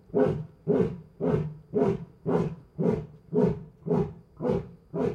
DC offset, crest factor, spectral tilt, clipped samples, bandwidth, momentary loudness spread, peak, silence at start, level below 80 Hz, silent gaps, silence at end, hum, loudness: under 0.1%; 18 dB; -10 dB/octave; under 0.1%; 7.2 kHz; 8 LU; -12 dBFS; 0.1 s; -52 dBFS; none; 0 s; none; -29 LUFS